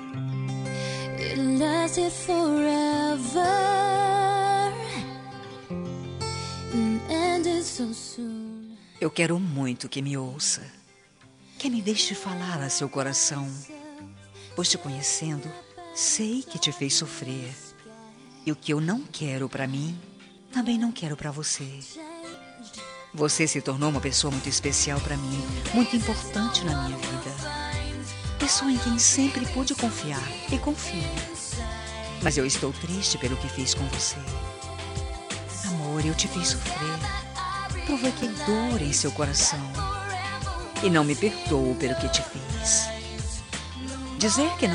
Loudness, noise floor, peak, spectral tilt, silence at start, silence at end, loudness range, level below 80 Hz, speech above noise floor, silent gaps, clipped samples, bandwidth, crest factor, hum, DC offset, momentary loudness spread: -26 LUFS; -55 dBFS; -6 dBFS; -3.5 dB/octave; 0 s; 0 s; 5 LU; -42 dBFS; 29 dB; none; under 0.1%; 11.5 kHz; 20 dB; none; under 0.1%; 13 LU